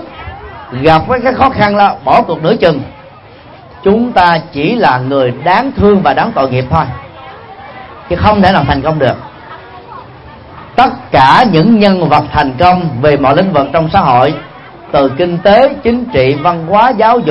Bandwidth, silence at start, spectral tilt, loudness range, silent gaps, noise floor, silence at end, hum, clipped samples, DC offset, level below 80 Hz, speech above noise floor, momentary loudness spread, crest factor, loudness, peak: 9.2 kHz; 0 s; -8 dB/octave; 4 LU; none; -34 dBFS; 0 s; none; 0.4%; under 0.1%; -34 dBFS; 26 dB; 21 LU; 10 dB; -9 LUFS; 0 dBFS